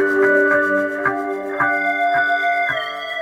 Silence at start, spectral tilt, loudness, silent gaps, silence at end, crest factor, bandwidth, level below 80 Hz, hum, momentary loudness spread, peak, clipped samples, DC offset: 0 s; -5 dB/octave; -18 LUFS; none; 0 s; 14 dB; 16 kHz; -62 dBFS; none; 9 LU; -4 dBFS; under 0.1%; under 0.1%